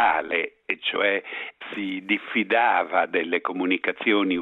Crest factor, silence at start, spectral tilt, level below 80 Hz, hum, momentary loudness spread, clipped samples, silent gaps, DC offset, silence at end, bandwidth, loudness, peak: 18 dB; 0 s; -6.5 dB/octave; -66 dBFS; none; 10 LU; under 0.1%; none; under 0.1%; 0 s; 4.2 kHz; -24 LUFS; -6 dBFS